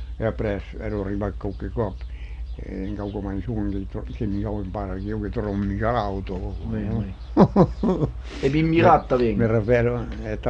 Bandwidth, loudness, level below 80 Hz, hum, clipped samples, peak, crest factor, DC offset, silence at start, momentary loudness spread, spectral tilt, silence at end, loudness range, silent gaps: 8 kHz; -24 LUFS; -34 dBFS; none; under 0.1%; -2 dBFS; 20 dB; under 0.1%; 0 s; 14 LU; -9 dB/octave; 0 s; 10 LU; none